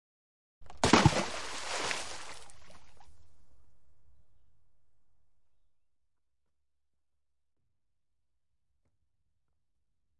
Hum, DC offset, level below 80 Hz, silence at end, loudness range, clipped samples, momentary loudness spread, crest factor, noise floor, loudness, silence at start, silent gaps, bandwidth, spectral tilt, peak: none; under 0.1%; -56 dBFS; 0 s; 18 LU; under 0.1%; 21 LU; 28 dB; -89 dBFS; -29 LUFS; 0.6 s; none; 11.5 kHz; -4 dB/octave; -10 dBFS